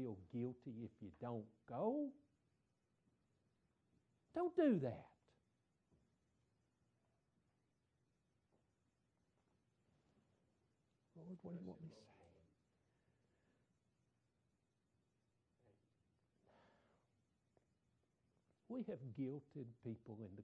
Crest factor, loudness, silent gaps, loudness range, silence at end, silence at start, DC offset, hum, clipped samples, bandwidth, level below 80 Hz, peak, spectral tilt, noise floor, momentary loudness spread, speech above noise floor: 24 dB; -47 LUFS; none; 16 LU; 0 s; 0 s; under 0.1%; none; under 0.1%; 7.4 kHz; -86 dBFS; -28 dBFS; -8.5 dB/octave; -86 dBFS; 18 LU; 40 dB